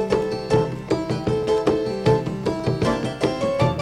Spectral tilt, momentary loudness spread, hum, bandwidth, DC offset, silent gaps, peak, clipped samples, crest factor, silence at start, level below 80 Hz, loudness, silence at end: -7 dB/octave; 4 LU; none; 12 kHz; under 0.1%; none; -4 dBFS; under 0.1%; 16 dB; 0 s; -42 dBFS; -22 LUFS; 0 s